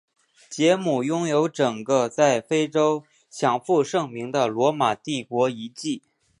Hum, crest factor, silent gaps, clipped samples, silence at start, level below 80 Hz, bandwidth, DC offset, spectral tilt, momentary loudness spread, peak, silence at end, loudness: none; 18 dB; none; under 0.1%; 0.5 s; -74 dBFS; 11.5 kHz; under 0.1%; -5 dB/octave; 10 LU; -4 dBFS; 0.4 s; -23 LUFS